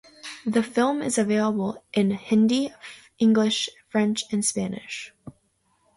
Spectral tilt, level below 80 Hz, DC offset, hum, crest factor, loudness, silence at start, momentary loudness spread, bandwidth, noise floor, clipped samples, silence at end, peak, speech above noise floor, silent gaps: -4.5 dB/octave; -64 dBFS; under 0.1%; none; 16 dB; -24 LUFS; 0.25 s; 15 LU; 11.5 kHz; -68 dBFS; under 0.1%; 0.65 s; -8 dBFS; 44 dB; none